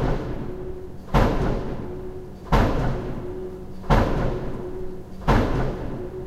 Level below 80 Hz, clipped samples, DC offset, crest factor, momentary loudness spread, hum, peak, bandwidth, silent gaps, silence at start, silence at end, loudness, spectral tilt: -28 dBFS; under 0.1%; under 0.1%; 18 dB; 15 LU; none; -4 dBFS; 13.5 kHz; none; 0 s; 0 s; -26 LUFS; -7.5 dB/octave